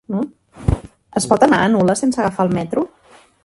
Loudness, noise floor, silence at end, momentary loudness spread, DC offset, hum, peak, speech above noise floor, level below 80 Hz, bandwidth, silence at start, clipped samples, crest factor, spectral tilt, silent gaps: -18 LUFS; -49 dBFS; 0.6 s; 12 LU; under 0.1%; none; 0 dBFS; 33 dB; -34 dBFS; 11.5 kHz; 0.1 s; under 0.1%; 18 dB; -5.5 dB/octave; none